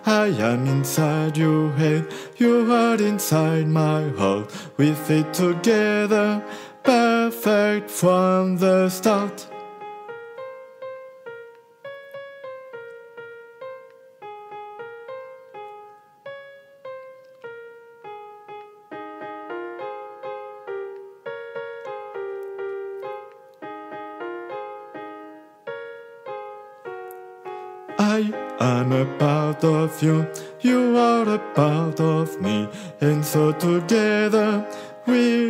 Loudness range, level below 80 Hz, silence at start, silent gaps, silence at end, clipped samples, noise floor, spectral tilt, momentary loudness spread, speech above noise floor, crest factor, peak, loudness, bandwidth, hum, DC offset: 20 LU; -74 dBFS; 0 s; none; 0 s; under 0.1%; -46 dBFS; -6 dB/octave; 21 LU; 27 dB; 20 dB; -2 dBFS; -21 LUFS; 16 kHz; none; under 0.1%